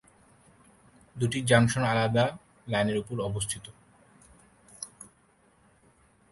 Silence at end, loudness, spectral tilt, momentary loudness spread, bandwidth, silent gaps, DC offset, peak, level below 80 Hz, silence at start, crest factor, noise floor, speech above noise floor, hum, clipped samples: 1.45 s; -27 LUFS; -5 dB/octave; 26 LU; 11.5 kHz; none; under 0.1%; -6 dBFS; -58 dBFS; 1.15 s; 24 dB; -64 dBFS; 37 dB; none; under 0.1%